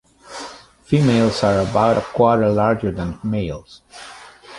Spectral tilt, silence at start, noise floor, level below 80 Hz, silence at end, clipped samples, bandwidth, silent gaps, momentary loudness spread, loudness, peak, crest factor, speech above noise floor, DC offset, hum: -7 dB/octave; 0.25 s; -37 dBFS; -42 dBFS; 0 s; under 0.1%; 11.5 kHz; none; 21 LU; -18 LUFS; -2 dBFS; 16 dB; 20 dB; under 0.1%; none